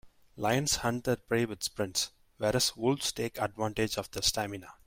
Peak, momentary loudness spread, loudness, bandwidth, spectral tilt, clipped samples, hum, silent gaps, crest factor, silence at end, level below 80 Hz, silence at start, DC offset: -12 dBFS; 6 LU; -31 LUFS; 16.5 kHz; -3.5 dB/octave; under 0.1%; none; none; 20 dB; 0.15 s; -54 dBFS; 0.05 s; under 0.1%